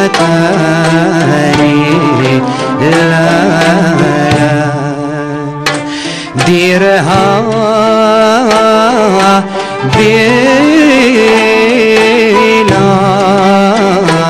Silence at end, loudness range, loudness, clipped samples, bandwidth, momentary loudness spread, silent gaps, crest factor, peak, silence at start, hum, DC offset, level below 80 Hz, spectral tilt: 0 s; 4 LU; -8 LUFS; under 0.1%; 15 kHz; 7 LU; none; 8 dB; 0 dBFS; 0 s; none; under 0.1%; -40 dBFS; -5.5 dB/octave